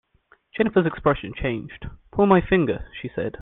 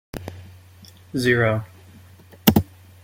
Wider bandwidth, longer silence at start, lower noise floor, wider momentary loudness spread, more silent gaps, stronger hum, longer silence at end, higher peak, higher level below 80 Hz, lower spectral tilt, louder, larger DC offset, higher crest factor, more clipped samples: second, 4 kHz vs 17 kHz; first, 0.55 s vs 0.15 s; first, -60 dBFS vs -47 dBFS; second, 16 LU vs 21 LU; neither; neither; second, 0 s vs 0.4 s; about the same, -2 dBFS vs 0 dBFS; first, -42 dBFS vs -48 dBFS; first, -10.5 dB/octave vs -5.5 dB/octave; about the same, -22 LUFS vs -21 LUFS; neither; about the same, 20 dB vs 24 dB; neither